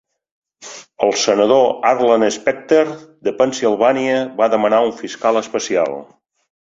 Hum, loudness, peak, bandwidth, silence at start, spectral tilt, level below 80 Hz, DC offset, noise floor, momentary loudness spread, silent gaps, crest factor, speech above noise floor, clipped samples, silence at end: none; -16 LUFS; 0 dBFS; 7.8 kHz; 0.6 s; -3.5 dB/octave; -62 dBFS; under 0.1%; -38 dBFS; 10 LU; none; 16 dB; 22 dB; under 0.1%; 0.65 s